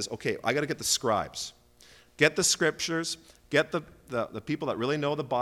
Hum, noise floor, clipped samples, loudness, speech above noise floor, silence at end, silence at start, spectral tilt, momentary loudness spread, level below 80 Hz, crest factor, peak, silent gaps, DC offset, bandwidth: none; -57 dBFS; under 0.1%; -28 LUFS; 28 dB; 0 s; 0 s; -3 dB/octave; 12 LU; -62 dBFS; 20 dB; -10 dBFS; none; under 0.1%; 16.5 kHz